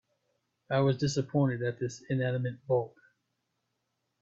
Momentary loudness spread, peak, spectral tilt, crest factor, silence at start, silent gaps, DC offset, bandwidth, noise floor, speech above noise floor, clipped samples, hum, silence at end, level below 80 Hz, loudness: 6 LU; -16 dBFS; -6.5 dB/octave; 16 dB; 0.7 s; none; under 0.1%; 7.8 kHz; -81 dBFS; 52 dB; under 0.1%; none; 1.35 s; -66 dBFS; -31 LUFS